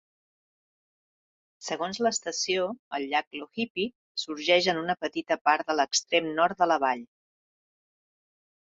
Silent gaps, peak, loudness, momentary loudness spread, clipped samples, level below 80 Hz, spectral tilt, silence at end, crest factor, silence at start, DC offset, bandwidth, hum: 2.79-2.91 s, 3.27-3.31 s, 3.70-3.75 s, 3.95-4.15 s, 5.41-5.45 s; -8 dBFS; -27 LUFS; 11 LU; under 0.1%; -74 dBFS; -2.5 dB/octave; 1.6 s; 22 dB; 1.6 s; under 0.1%; 8 kHz; none